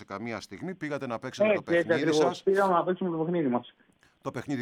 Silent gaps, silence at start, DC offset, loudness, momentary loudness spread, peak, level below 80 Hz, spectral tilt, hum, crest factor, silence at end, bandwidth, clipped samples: none; 0 s; under 0.1%; -28 LUFS; 13 LU; -12 dBFS; -72 dBFS; -6 dB/octave; none; 18 dB; 0 s; 14 kHz; under 0.1%